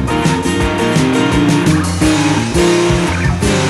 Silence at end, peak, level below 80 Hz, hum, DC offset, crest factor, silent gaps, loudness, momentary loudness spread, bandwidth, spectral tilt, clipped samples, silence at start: 0 s; -2 dBFS; -26 dBFS; none; under 0.1%; 10 dB; none; -13 LUFS; 3 LU; 15 kHz; -5 dB/octave; under 0.1%; 0 s